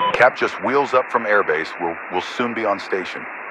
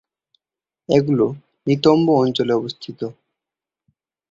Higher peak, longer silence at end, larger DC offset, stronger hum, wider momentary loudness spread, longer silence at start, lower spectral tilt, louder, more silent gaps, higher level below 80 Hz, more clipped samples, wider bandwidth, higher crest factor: about the same, 0 dBFS vs -2 dBFS; second, 0 s vs 1.2 s; neither; neither; second, 10 LU vs 15 LU; second, 0 s vs 0.9 s; second, -4.5 dB/octave vs -7.5 dB/octave; about the same, -20 LUFS vs -18 LUFS; neither; about the same, -62 dBFS vs -60 dBFS; neither; first, 10.5 kHz vs 7.8 kHz; about the same, 20 dB vs 18 dB